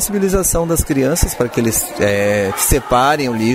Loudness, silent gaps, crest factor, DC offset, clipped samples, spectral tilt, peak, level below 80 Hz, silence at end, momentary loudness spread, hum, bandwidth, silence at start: -15 LUFS; none; 14 dB; under 0.1%; under 0.1%; -4 dB/octave; 0 dBFS; -28 dBFS; 0 s; 3 LU; none; 16 kHz; 0 s